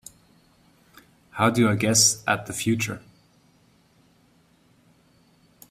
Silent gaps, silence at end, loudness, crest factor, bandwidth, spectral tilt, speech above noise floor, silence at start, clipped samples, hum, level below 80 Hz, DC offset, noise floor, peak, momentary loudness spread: none; 2.7 s; -21 LUFS; 22 dB; 16 kHz; -3 dB/octave; 38 dB; 1.35 s; under 0.1%; none; -62 dBFS; under 0.1%; -60 dBFS; -4 dBFS; 14 LU